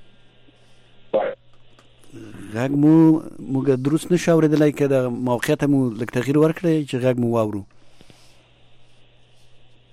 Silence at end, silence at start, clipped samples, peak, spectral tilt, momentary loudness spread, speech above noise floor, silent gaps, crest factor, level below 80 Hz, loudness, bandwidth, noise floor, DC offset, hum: 0.35 s; 0 s; under 0.1%; -6 dBFS; -7.5 dB/octave; 11 LU; 31 dB; none; 14 dB; -56 dBFS; -19 LUFS; 14.5 kHz; -50 dBFS; under 0.1%; none